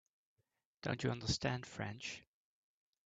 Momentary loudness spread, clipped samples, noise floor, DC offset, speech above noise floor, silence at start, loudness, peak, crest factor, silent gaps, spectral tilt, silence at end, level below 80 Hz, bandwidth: 9 LU; under 0.1%; -86 dBFS; under 0.1%; 45 dB; 0.85 s; -41 LUFS; -22 dBFS; 22 dB; none; -4.5 dB/octave; 0.85 s; -64 dBFS; 9 kHz